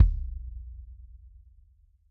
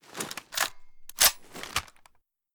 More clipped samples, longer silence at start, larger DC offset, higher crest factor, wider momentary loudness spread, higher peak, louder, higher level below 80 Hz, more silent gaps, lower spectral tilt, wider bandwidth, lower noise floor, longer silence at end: neither; about the same, 0 s vs 0.1 s; neither; second, 22 dB vs 28 dB; first, 21 LU vs 16 LU; about the same, -6 dBFS vs -4 dBFS; second, -33 LUFS vs -27 LUFS; first, -32 dBFS vs -56 dBFS; neither; first, -10.5 dB/octave vs 1 dB/octave; second, 0.5 kHz vs over 20 kHz; about the same, -60 dBFS vs -63 dBFS; first, 1.05 s vs 0.7 s